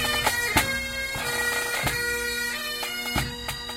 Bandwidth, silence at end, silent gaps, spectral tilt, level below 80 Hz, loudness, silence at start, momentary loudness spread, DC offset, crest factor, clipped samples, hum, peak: 16 kHz; 0 s; none; -2 dB/octave; -42 dBFS; -25 LUFS; 0 s; 6 LU; under 0.1%; 20 dB; under 0.1%; none; -6 dBFS